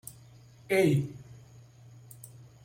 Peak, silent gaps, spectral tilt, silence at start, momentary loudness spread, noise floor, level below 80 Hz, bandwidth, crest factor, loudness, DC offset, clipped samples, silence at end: -14 dBFS; none; -6.5 dB/octave; 0.7 s; 26 LU; -54 dBFS; -66 dBFS; 16.5 kHz; 20 dB; -28 LUFS; under 0.1%; under 0.1%; 0.4 s